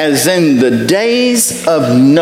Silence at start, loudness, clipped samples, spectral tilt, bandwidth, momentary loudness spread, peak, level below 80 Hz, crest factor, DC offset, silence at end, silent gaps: 0 s; -10 LUFS; under 0.1%; -4 dB/octave; 16.5 kHz; 2 LU; 0 dBFS; -52 dBFS; 10 dB; under 0.1%; 0 s; none